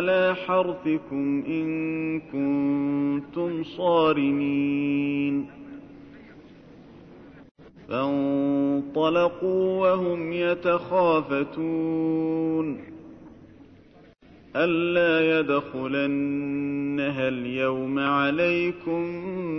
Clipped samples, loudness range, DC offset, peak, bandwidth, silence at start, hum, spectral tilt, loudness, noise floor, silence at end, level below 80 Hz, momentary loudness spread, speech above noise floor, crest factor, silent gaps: under 0.1%; 6 LU; under 0.1%; -10 dBFS; 6 kHz; 0 s; none; -8.5 dB/octave; -25 LUFS; -53 dBFS; 0 s; -62 dBFS; 7 LU; 28 dB; 16 dB; 7.51-7.55 s